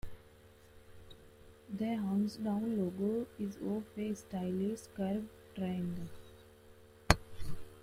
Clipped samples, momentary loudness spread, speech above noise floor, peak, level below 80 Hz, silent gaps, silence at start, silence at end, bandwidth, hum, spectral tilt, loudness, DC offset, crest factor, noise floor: under 0.1%; 23 LU; 23 dB; -2 dBFS; -52 dBFS; none; 0.05 s; 0 s; 16 kHz; none; -6 dB/octave; -37 LUFS; under 0.1%; 36 dB; -60 dBFS